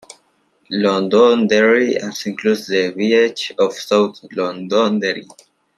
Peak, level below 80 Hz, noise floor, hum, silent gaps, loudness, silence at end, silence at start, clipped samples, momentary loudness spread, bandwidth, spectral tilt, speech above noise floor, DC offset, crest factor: -2 dBFS; -66 dBFS; -60 dBFS; none; none; -16 LUFS; 0.55 s; 0.7 s; under 0.1%; 10 LU; 13.5 kHz; -4.5 dB/octave; 44 dB; under 0.1%; 16 dB